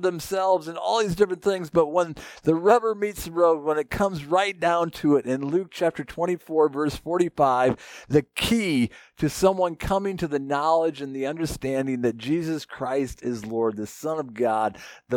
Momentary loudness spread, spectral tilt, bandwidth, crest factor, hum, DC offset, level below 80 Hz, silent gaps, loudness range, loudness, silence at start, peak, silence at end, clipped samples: 8 LU; -5.5 dB/octave; 18.5 kHz; 20 dB; none; under 0.1%; -48 dBFS; none; 4 LU; -24 LUFS; 0 s; -4 dBFS; 0 s; under 0.1%